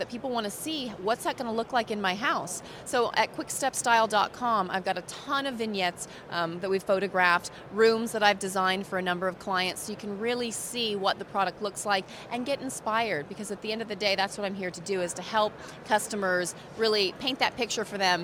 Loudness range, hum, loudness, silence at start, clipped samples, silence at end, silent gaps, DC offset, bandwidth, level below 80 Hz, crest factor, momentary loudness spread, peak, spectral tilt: 4 LU; none; -28 LUFS; 0 s; under 0.1%; 0 s; none; under 0.1%; over 20 kHz; -64 dBFS; 22 dB; 9 LU; -8 dBFS; -3 dB/octave